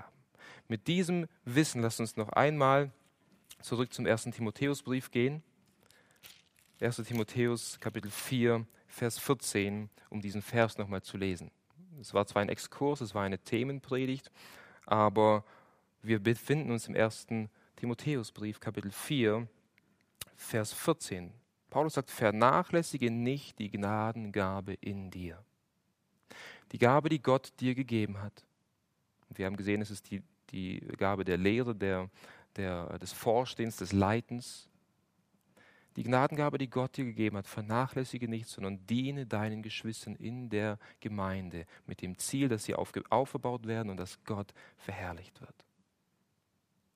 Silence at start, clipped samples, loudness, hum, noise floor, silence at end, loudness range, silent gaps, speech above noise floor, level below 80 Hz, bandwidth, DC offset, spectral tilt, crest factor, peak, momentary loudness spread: 0 s; under 0.1%; -34 LUFS; none; -78 dBFS; 1.45 s; 6 LU; none; 45 dB; -72 dBFS; 15.5 kHz; under 0.1%; -5.5 dB/octave; 24 dB; -10 dBFS; 15 LU